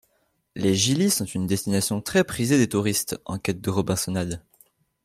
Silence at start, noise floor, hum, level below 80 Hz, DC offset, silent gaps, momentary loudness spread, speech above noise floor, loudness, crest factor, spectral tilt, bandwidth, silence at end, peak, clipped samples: 0.55 s; -69 dBFS; none; -56 dBFS; under 0.1%; none; 9 LU; 46 dB; -24 LUFS; 18 dB; -4.5 dB/octave; 16 kHz; 0.65 s; -6 dBFS; under 0.1%